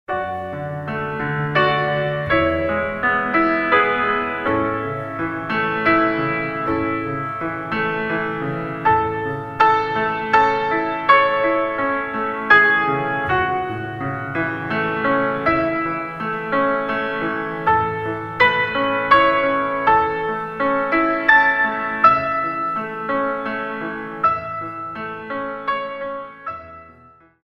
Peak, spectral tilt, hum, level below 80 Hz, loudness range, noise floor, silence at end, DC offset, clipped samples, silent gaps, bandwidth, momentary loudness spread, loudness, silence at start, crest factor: 0 dBFS; -7 dB/octave; none; -48 dBFS; 5 LU; -49 dBFS; 0.55 s; under 0.1%; under 0.1%; none; 7.8 kHz; 12 LU; -19 LUFS; 0.1 s; 20 dB